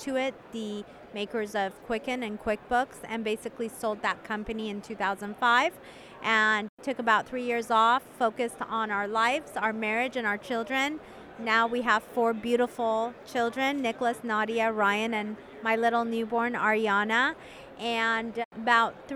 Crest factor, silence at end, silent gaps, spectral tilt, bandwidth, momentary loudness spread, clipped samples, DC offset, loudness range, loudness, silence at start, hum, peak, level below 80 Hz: 20 dB; 0 s; 6.69-6.77 s, 18.45-18.51 s; -4 dB/octave; 15 kHz; 11 LU; under 0.1%; under 0.1%; 5 LU; -28 LUFS; 0 s; none; -8 dBFS; -62 dBFS